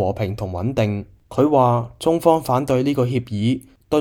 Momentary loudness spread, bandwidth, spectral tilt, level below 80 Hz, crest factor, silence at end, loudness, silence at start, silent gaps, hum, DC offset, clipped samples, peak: 9 LU; 17 kHz; -7.5 dB/octave; -48 dBFS; 18 dB; 0 s; -20 LUFS; 0 s; none; none; under 0.1%; under 0.1%; -2 dBFS